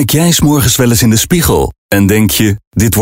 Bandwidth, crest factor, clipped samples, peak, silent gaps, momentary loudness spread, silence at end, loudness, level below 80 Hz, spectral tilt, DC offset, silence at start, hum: 16.5 kHz; 10 dB; under 0.1%; 0 dBFS; 1.78-1.89 s, 2.67-2.71 s; 5 LU; 0 s; -9 LUFS; -26 dBFS; -4.5 dB/octave; under 0.1%; 0 s; none